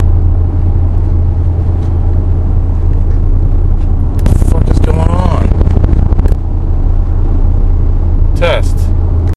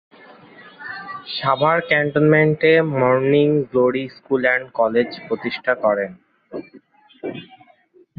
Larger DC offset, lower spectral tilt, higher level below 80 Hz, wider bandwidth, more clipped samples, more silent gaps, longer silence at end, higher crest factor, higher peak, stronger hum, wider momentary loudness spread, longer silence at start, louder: neither; second, -8 dB/octave vs -9.5 dB/octave; first, -10 dBFS vs -62 dBFS; second, 4.5 kHz vs 5 kHz; first, 0.6% vs under 0.1%; neither; second, 0 s vs 0.75 s; second, 8 dB vs 18 dB; about the same, 0 dBFS vs -2 dBFS; neither; second, 3 LU vs 18 LU; second, 0 s vs 0.6 s; first, -12 LUFS vs -18 LUFS